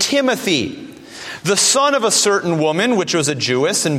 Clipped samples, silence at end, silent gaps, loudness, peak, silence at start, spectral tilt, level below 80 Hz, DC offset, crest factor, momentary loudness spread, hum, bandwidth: under 0.1%; 0 s; none; -15 LUFS; -2 dBFS; 0 s; -3 dB/octave; -60 dBFS; under 0.1%; 14 dB; 16 LU; none; 16.5 kHz